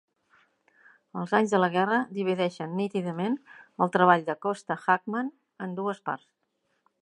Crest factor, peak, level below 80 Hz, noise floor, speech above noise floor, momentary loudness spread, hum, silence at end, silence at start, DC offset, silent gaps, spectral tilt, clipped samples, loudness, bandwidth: 24 dB; -6 dBFS; -80 dBFS; -72 dBFS; 45 dB; 15 LU; none; 0.85 s; 1.15 s; under 0.1%; none; -6.5 dB/octave; under 0.1%; -27 LUFS; 11 kHz